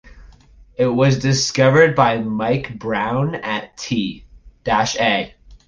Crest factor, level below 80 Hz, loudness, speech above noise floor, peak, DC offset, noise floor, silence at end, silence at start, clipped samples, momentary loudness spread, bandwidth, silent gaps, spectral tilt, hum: 16 dB; -46 dBFS; -18 LUFS; 29 dB; -2 dBFS; under 0.1%; -46 dBFS; 0.1 s; 0.05 s; under 0.1%; 12 LU; 9.8 kHz; none; -5 dB/octave; none